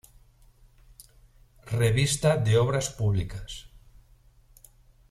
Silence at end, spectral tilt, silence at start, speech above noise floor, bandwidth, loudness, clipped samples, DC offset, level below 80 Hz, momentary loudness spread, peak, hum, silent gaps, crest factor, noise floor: 1.45 s; -5 dB/octave; 1.65 s; 33 dB; 14 kHz; -25 LUFS; under 0.1%; under 0.1%; -48 dBFS; 16 LU; -10 dBFS; none; none; 18 dB; -57 dBFS